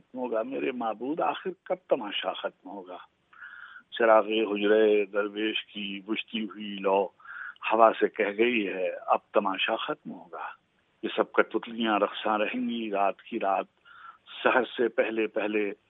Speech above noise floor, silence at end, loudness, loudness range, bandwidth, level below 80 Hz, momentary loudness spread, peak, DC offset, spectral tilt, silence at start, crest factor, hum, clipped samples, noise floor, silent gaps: 23 dB; 0.15 s; -28 LUFS; 3 LU; 4 kHz; -86 dBFS; 18 LU; -4 dBFS; under 0.1%; -8 dB/octave; 0.15 s; 24 dB; none; under 0.1%; -51 dBFS; none